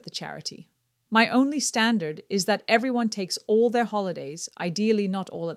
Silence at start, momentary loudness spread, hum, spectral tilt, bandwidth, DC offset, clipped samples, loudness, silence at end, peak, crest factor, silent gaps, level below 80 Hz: 0.05 s; 12 LU; none; -4 dB/octave; 15 kHz; under 0.1%; under 0.1%; -24 LUFS; 0 s; -6 dBFS; 20 dB; none; -76 dBFS